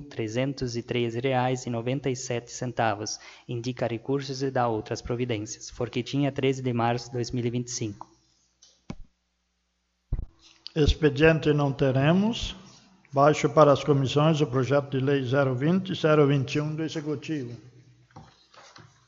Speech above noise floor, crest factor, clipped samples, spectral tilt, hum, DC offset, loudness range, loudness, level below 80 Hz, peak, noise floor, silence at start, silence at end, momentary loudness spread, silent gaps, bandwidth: 50 dB; 22 dB; under 0.1%; -6 dB/octave; none; under 0.1%; 9 LU; -26 LUFS; -44 dBFS; -4 dBFS; -75 dBFS; 0 s; 0.45 s; 15 LU; none; 7.8 kHz